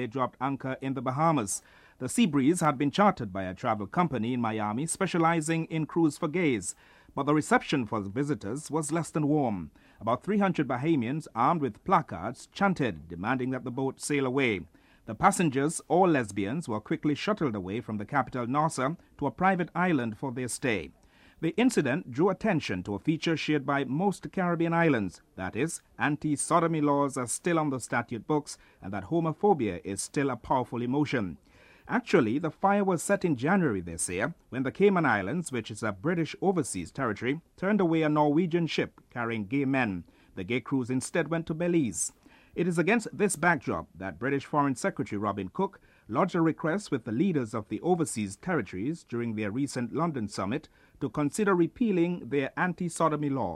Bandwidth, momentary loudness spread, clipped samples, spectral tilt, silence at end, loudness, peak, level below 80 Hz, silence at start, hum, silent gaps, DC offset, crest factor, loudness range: 14 kHz; 9 LU; under 0.1%; -5.5 dB/octave; 0 s; -29 LUFS; -8 dBFS; -62 dBFS; 0 s; none; none; under 0.1%; 20 dB; 2 LU